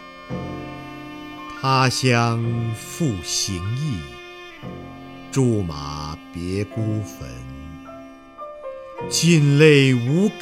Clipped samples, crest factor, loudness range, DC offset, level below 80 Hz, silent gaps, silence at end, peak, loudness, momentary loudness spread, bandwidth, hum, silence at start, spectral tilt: under 0.1%; 20 dB; 9 LU; under 0.1%; -48 dBFS; none; 0 s; 0 dBFS; -20 LUFS; 22 LU; 15 kHz; none; 0 s; -5 dB/octave